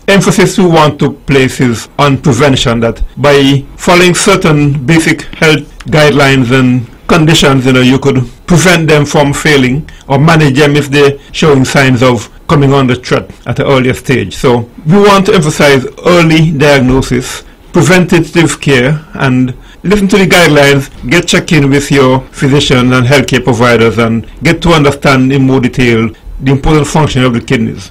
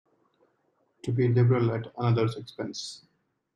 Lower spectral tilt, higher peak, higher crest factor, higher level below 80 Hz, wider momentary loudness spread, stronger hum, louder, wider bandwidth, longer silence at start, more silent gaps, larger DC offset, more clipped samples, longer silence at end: second, -5.5 dB/octave vs -7.5 dB/octave; first, 0 dBFS vs -12 dBFS; second, 8 dB vs 16 dB; first, -26 dBFS vs -66 dBFS; second, 7 LU vs 16 LU; neither; first, -7 LUFS vs -27 LUFS; first, 16.5 kHz vs 9.2 kHz; second, 0.1 s vs 1.05 s; neither; first, 0.5% vs under 0.1%; first, 0.8% vs under 0.1%; second, 0 s vs 0.6 s